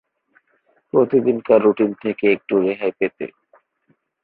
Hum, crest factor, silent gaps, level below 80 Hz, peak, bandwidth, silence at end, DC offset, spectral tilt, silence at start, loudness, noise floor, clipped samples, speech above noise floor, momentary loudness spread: none; 18 dB; none; -64 dBFS; -2 dBFS; 4.4 kHz; 0.95 s; under 0.1%; -11.5 dB/octave; 0.95 s; -18 LUFS; -64 dBFS; under 0.1%; 47 dB; 9 LU